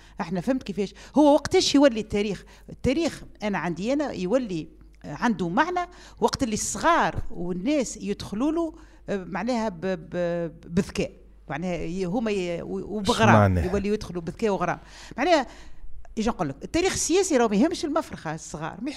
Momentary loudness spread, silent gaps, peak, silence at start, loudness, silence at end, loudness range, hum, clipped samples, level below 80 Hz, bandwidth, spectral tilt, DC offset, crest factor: 13 LU; none; -4 dBFS; 0.15 s; -25 LUFS; 0 s; 5 LU; none; under 0.1%; -44 dBFS; 14 kHz; -5 dB/octave; under 0.1%; 20 dB